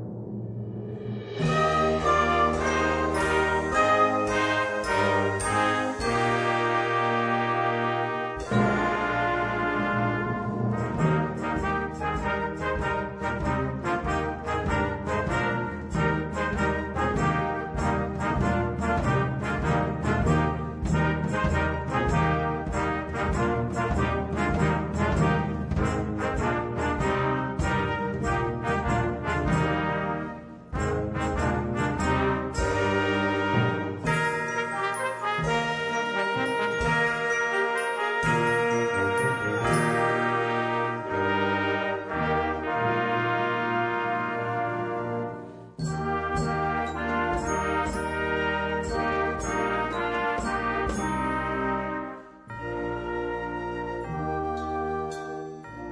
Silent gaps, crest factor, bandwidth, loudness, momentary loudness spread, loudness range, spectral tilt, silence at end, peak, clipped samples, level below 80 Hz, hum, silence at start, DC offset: none; 16 dB; 10.5 kHz; -26 LUFS; 7 LU; 5 LU; -6 dB/octave; 0 s; -10 dBFS; under 0.1%; -40 dBFS; none; 0 s; under 0.1%